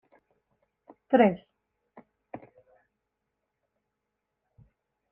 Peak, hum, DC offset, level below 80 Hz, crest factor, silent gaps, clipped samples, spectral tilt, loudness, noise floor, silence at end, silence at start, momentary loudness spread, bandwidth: -8 dBFS; none; under 0.1%; -72 dBFS; 26 dB; none; under 0.1%; -5.5 dB/octave; -24 LUFS; -84 dBFS; 2.75 s; 1.1 s; 25 LU; 3.4 kHz